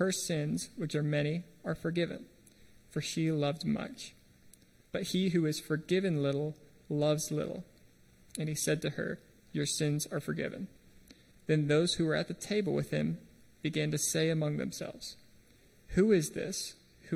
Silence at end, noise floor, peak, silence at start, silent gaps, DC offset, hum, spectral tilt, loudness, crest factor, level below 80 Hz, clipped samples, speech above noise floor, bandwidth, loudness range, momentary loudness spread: 0 s; -62 dBFS; -16 dBFS; 0 s; none; under 0.1%; none; -5 dB/octave; -33 LUFS; 18 dB; -62 dBFS; under 0.1%; 29 dB; 15.5 kHz; 3 LU; 13 LU